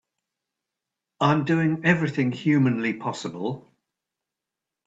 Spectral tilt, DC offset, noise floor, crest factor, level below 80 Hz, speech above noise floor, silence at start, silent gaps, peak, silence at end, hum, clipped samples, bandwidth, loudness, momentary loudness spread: -7 dB/octave; under 0.1%; -87 dBFS; 20 dB; -66 dBFS; 64 dB; 1.2 s; none; -6 dBFS; 1.25 s; none; under 0.1%; 8 kHz; -24 LUFS; 10 LU